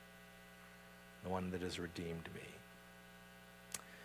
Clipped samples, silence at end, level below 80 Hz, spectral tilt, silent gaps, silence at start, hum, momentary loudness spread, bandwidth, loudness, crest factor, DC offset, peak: under 0.1%; 0 s; -66 dBFS; -4.5 dB/octave; none; 0 s; 60 Hz at -65 dBFS; 15 LU; 16 kHz; -49 LUFS; 28 dB; under 0.1%; -22 dBFS